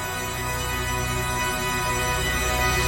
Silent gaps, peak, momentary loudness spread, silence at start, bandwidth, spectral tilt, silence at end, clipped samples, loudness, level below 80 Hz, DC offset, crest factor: none; -10 dBFS; 5 LU; 0 s; over 20 kHz; -3 dB/octave; 0 s; under 0.1%; -24 LUFS; -34 dBFS; under 0.1%; 14 dB